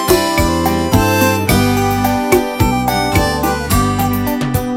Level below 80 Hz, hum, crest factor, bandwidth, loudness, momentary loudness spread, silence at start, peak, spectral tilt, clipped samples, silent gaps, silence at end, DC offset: -26 dBFS; none; 14 dB; 16.5 kHz; -14 LUFS; 4 LU; 0 s; 0 dBFS; -5 dB/octave; under 0.1%; none; 0 s; under 0.1%